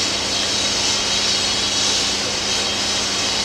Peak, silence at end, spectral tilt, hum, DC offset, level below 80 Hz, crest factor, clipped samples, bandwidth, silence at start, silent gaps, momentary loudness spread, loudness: -6 dBFS; 0 s; -0.5 dB/octave; none; under 0.1%; -44 dBFS; 14 dB; under 0.1%; 16 kHz; 0 s; none; 2 LU; -17 LUFS